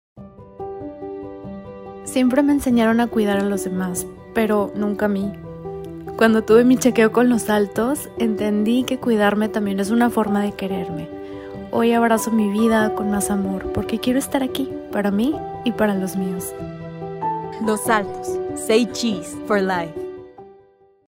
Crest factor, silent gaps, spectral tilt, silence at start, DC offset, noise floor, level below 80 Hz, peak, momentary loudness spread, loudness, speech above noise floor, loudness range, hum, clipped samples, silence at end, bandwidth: 18 dB; none; -5.5 dB/octave; 0.15 s; under 0.1%; -53 dBFS; -50 dBFS; -2 dBFS; 16 LU; -20 LUFS; 35 dB; 5 LU; none; under 0.1%; 0.55 s; 16 kHz